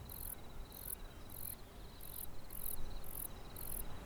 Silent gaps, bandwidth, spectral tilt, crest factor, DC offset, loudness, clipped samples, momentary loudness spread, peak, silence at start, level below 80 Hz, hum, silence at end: none; over 20 kHz; -3.5 dB/octave; 20 dB; under 0.1%; -47 LUFS; under 0.1%; 7 LU; -24 dBFS; 0 s; -50 dBFS; none; 0 s